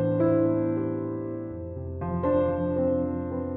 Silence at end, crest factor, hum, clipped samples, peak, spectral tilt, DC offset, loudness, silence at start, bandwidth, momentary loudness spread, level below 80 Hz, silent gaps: 0 s; 14 dB; none; under 0.1%; -12 dBFS; -10 dB/octave; under 0.1%; -27 LUFS; 0 s; 3.9 kHz; 12 LU; -54 dBFS; none